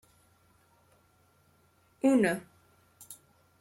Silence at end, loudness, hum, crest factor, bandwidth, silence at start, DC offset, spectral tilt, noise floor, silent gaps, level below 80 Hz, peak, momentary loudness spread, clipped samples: 0.45 s; -28 LUFS; none; 20 dB; 16.5 kHz; 2.05 s; under 0.1%; -5.5 dB/octave; -67 dBFS; none; -74 dBFS; -14 dBFS; 24 LU; under 0.1%